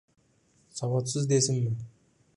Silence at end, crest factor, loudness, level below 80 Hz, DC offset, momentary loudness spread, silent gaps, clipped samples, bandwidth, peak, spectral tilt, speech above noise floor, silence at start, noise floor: 0.5 s; 18 dB; -28 LUFS; -66 dBFS; under 0.1%; 16 LU; none; under 0.1%; 11.5 kHz; -12 dBFS; -5 dB/octave; 39 dB; 0.75 s; -66 dBFS